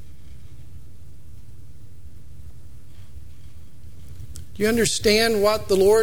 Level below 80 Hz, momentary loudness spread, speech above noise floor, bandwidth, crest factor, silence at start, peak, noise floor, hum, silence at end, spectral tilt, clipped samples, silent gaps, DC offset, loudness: -44 dBFS; 27 LU; 27 dB; 19 kHz; 18 dB; 0.3 s; -6 dBFS; -45 dBFS; none; 0 s; -3.5 dB/octave; under 0.1%; none; 3%; -19 LUFS